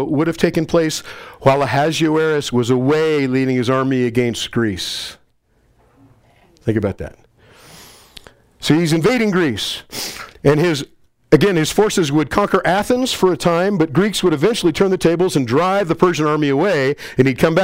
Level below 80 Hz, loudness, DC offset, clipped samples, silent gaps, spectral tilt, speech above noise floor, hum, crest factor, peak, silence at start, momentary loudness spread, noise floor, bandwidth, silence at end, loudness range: -44 dBFS; -17 LUFS; under 0.1%; under 0.1%; none; -5.5 dB/octave; 42 dB; none; 16 dB; 0 dBFS; 0 s; 9 LU; -58 dBFS; 16 kHz; 0 s; 8 LU